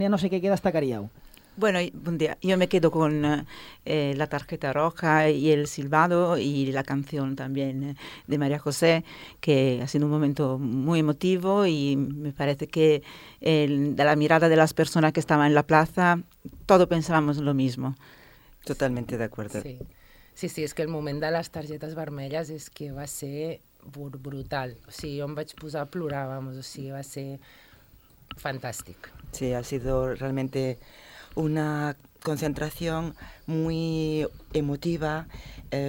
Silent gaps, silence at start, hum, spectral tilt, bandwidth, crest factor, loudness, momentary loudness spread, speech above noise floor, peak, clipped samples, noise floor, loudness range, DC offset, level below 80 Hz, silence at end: none; 0 s; none; -6 dB/octave; 17 kHz; 22 dB; -26 LUFS; 16 LU; 30 dB; -4 dBFS; under 0.1%; -55 dBFS; 13 LU; under 0.1%; -50 dBFS; 0 s